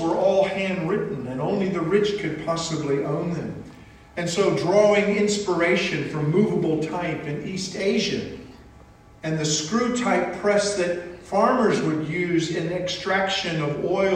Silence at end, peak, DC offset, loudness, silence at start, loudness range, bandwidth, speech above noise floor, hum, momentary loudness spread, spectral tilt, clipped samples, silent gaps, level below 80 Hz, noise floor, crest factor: 0 s; -6 dBFS; under 0.1%; -23 LUFS; 0 s; 4 LU; 10.5 kHz; 26 dB; none; 10 LU; -5 dB/octave; under 0.1%; none; -54 dBFS; -48 dBFS; 18 dB